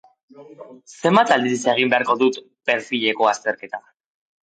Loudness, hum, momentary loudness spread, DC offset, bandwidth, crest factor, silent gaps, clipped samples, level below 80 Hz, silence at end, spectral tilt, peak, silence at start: -19 LUFS; none; 11 LU; under 0.1%; 9.4 kHz; 18 dB; none; under 0.1%; -72 dBFS; 0.7 s; -4 dB/octave; -4 dBFS; 0.4 s